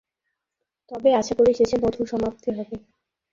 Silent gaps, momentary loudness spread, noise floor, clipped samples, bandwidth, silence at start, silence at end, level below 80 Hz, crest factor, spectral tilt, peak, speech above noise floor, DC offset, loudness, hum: none; 17 LU; -83 dBFS; under 0.1%; 7.6 kHz; 0.9 s; 0.55 s; -52 dBFS; 16 dB; -5.5 dB/octave; -8 dBFS; 61 dB; under 0.1%; -22 LUFS; none